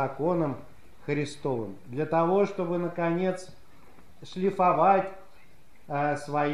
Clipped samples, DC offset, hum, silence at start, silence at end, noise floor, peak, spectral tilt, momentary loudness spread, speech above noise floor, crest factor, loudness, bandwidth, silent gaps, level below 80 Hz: under 0.1%; 0.6%; none; 0 s; 0 s; -59 dBFS; -10 dBFS; -7 dB/octave; 14 LU; 32 dB; 18 dB; -27 LUFS; 13.5 kHz; none; -64 dBFS